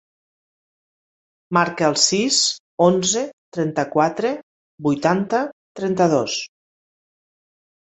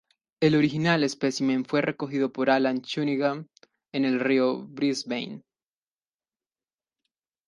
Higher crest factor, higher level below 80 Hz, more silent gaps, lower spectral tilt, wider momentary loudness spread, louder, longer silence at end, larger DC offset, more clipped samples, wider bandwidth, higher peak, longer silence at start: about the same, 20 dB vs 20 dB; first, -62 dBFS vs -68 dBFS; first, 2.60-2.78 s, 3.33-3.52 s, 4.43-4.78 s, 5.53-5.75 s vs none; second, -3.5 dB/octave vs -5.5 dB/octave; about the same, 11 LU vs 9 LU; first, -19 LUFS vs -25 LUFS; second, 1.45 s vs 2.1 s; neither; neither; second, 8.2 kHz vs 11.5 kHz; first, -2 dBFS vs -8 dBFS; first, 1.5 s vs 0.4 s